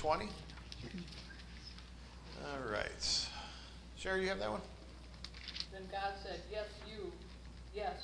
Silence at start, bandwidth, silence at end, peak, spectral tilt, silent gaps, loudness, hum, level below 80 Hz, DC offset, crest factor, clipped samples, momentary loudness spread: 0 s; 10.5 kHz; 0 s; -20 dBFS; -3 dB/octave; none; -42 LUFS; none; -54 dBFS; under 0.1%; 22 dB; under 0.1%; 17 LU